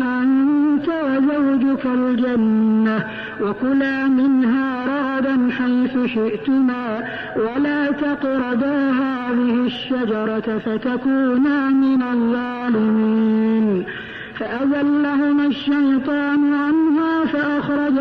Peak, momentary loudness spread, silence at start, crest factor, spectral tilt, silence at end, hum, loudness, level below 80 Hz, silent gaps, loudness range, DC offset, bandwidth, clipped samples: -10 dBFS; 6 LU; 0 s; 8 dB; -8 dB/octave; 0 s; none; -19 LUFS; -56 dBFS; none; 2 LU; under 0.1%; 5.2 kHz; under 0.1%